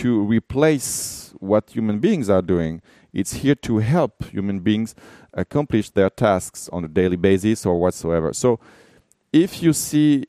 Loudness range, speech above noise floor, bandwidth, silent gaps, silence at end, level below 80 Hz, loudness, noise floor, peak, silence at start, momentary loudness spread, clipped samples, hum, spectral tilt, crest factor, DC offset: 2 LU; 26 dB; 15.5 kHz; none; 0.05 s; -46 dBFS; -20 LUFS; -45 dBFS; -2 dBFS; 0 s; 10 LU; under 0.1%; none; -6 dB/octave; 18 dB; under 0.1%